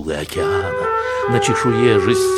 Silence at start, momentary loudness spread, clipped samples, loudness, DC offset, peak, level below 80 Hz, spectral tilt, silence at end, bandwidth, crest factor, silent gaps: 0 s; 6 LU; under 0.1%; -17 LUFS; under 0.1%; -2 dBFS; -42 dBFS; -5 dB/octave; 0 s; 14 kHz; 14 dB; none